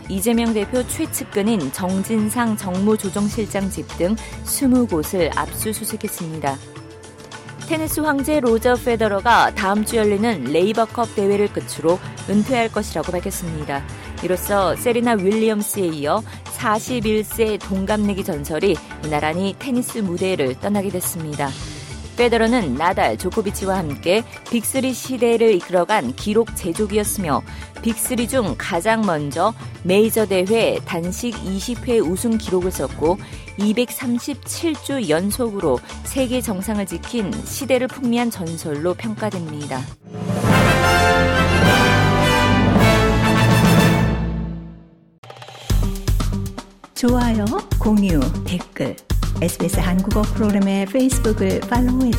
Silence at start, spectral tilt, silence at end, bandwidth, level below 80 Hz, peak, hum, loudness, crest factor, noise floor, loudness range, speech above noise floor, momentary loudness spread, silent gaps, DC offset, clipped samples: 0 s; -5 dB/octave; 0 s; 16.5 kHz; -32 dBFS; -2 dBFS; none; -19 LUFS; 16 dB; -43 dBFS; 6 LU; 23 dB; 11 LU; 45.18-45.23 s; under 0.1%; under 0.1%